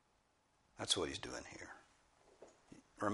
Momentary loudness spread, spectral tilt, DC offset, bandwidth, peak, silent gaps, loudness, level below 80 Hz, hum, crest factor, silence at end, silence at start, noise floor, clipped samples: 25 LU; -2.5 dB/octave; under 0.1%; 11.5 kHz; -20 dBFS; none; -41 LUFS; -70 dBFS; none; 26 dB; 0 s; 0.75 s; -77 dBFS; under 0.1%